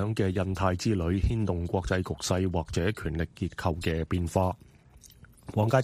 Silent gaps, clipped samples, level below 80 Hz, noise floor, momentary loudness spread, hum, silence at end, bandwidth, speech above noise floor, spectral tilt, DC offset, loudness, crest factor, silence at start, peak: none; under 0.1%; -40 dBFS; -54 dBFS; 5 LU; none; 0 s; 15 kHz; 27 dB; -6.5 dB/octave; under 0.1%; -29 LUFS; 18 dB; 0 s; -10 dBFS